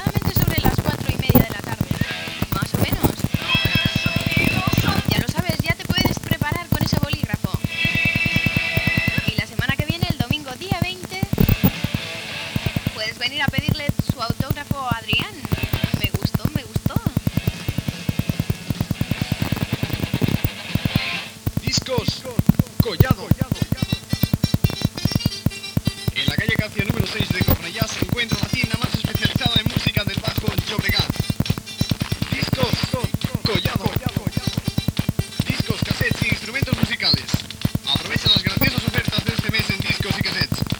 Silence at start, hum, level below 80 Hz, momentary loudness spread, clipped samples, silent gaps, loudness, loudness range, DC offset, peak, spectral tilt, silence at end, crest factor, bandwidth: 0 s; none; -36 dBFS; 7 LU; under 0.1%; none; -21 LUFS; 4 LU; under 0.1%; 0 dBFS; -5 dB/octave; 0 s; 22 dB; over 20 kHz